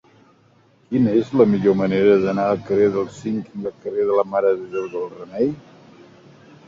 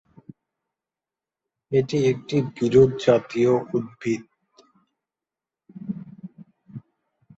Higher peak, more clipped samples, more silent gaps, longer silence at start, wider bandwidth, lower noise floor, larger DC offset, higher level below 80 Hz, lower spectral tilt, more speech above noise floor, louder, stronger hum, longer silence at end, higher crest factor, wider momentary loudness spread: about the same, -2 dBFS vs -4 dBFS; neither; neither; second, 0.9 s vs 1.7 s; about the same, 7.4 kHz vs 8 kHz; second, -56 dBFS vs -90 dBFS; neither; about the same, -56 dBFS vs -58 dBFS; about the same, -8 dB/octave vs -7 dB/octave; second, 37 dB vs 69 dB; about the same, -20 LUFS vs -22 LUFS; neither; first, 1.1 s vs 0.6 s; about the same, 18 dB vs 20 dB; second, 13 LU vs 26 LU